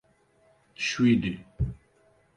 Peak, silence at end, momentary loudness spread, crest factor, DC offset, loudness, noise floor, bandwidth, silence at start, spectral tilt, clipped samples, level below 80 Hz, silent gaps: -12 dBFS; 0.6 s; 11 LU; 16 dB; under 0.1%; -27 LUFS; -64 dBFS; 9 kHz; 0.8 s; -5.5 dB/octave; under 0.1%; -46 dBFS; none